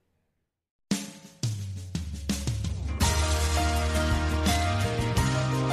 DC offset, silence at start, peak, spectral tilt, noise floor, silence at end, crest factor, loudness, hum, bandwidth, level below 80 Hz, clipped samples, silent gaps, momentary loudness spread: under 0.1%; 0.9 s; -12 dBFS; -4.5 dB/octave; -78 dBFS; 0 s; 16 dB; -28 LUFS; none; 15 kHz; -32 dBFS; under 0.1%; none; 9 LU